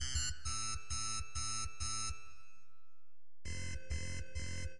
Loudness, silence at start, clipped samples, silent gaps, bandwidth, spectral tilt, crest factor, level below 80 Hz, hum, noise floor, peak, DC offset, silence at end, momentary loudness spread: -41 LUFS; 0 s; under 0.1%; none; 11.5 kHz; -1.5 dB/octave; 18 dB; -50 dBFS; none; -85 dBFS; -24 dBFS; 1%; 0 s; 8 LU